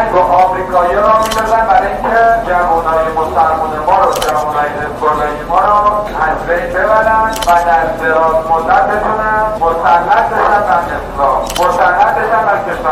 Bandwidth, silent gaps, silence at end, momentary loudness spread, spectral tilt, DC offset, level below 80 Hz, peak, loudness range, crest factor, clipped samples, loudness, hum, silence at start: 15.5 kHz; none; 0 s; 5 LU; -4.5 dB/octave; under 0.1%; -30 dBFS; 0 dBFS; 1 LU; 10 dB; under 0.1%; -11 LUFS; none; 0 s